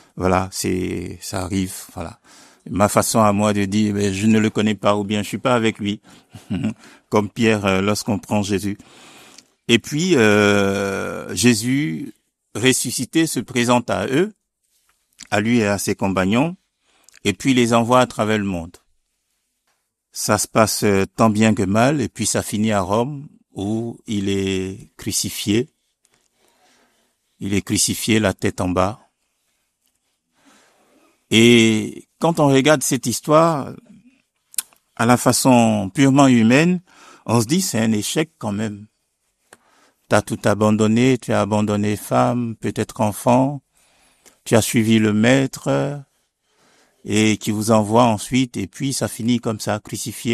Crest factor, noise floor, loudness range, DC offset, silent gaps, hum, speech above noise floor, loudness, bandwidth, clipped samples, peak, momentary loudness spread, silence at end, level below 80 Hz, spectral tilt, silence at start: 20 dB; -72 dBFS; 6 LU; under 0.1%; none; none; 54 dB; -18 LUFS; 14 kHz; under 0.1%; 0 dBFS; 12 LU; 0 s; -54 dBFS; -4.5 dB/octave; 0.15 s